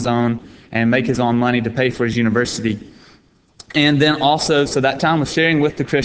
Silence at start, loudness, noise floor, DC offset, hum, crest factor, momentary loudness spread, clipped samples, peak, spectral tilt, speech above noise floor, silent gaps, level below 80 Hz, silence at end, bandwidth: 0 s; -17 LUFS; -52 dBFS; under 0.1%; none; 16 dB; 8 LU; under 0.1%; 0 dBFS; -5 dB/octave; 35 dB; none; -46 dBFS; 0 s; 8 kHz